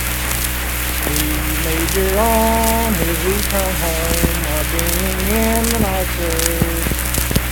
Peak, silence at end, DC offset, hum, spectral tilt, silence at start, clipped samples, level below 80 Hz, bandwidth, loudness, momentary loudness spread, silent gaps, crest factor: 0 dBFS; 0 s; under 0.1%; none; -3.5 dB/octave; 0 s; under 0.1%; -22 dBFS; 19.5 kHz; -17 LUFS; 4 LU; none; 16 dB